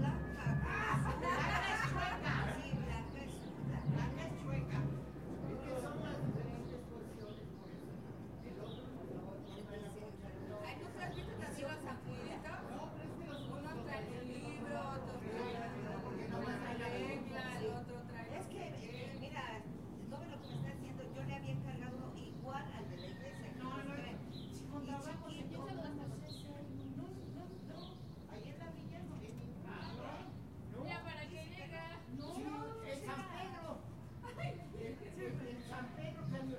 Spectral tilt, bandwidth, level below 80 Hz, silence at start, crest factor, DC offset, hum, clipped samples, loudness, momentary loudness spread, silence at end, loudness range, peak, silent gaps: -6.5 dB/octave; 15.5 kHz; -58 dBFS; 0 s; 20 dB; under 0.1%; none; under 0.1%; -45 LUFS; 11 LU; 0 s; 8 LU; -24 dBFS; none